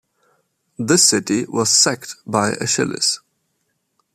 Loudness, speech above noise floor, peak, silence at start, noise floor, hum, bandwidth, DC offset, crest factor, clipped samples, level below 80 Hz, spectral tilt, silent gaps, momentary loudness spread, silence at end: -16 LUFS; 52 dB; 0 dBFS; 0.8 s; -70 dBFS; none; 15 kHz; under 0.1%; 20 dB; under 0.1%; -62 dBFS; -2.5 dB/octave; none; 12 LU; 0.95 s